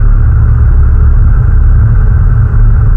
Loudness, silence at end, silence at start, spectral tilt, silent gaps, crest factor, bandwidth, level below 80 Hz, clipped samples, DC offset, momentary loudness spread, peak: -9 LUFS; 0 s; 0 s; -11.5 dB/octave; none; 4 dB; 2 kHz; -6 dBFS; under 0.1%; under 0.1%; 1 LU; 0 dBFS